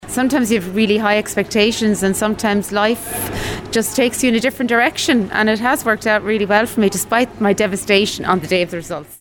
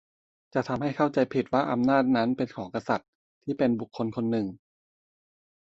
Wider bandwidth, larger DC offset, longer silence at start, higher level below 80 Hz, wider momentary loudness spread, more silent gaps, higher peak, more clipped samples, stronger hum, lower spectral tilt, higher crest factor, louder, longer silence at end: first, 19 kHz vs 7.6 kHz; neither; second, 0 s vs 0.55 s; first, -44 dBFS vs -64 dBFS; second, 5 LU vs 9 LU; second, none vs 3.08-3.41 s; first, -2 dBFS vs -10 dBFS; neither; neither; second, -4 dB/octave vs -7.5 dB/octave; about the same, 16 dB vs 18 dB; first, -16 LUFS vs -27 LUFS; second, 0.05 s vs 1.1 s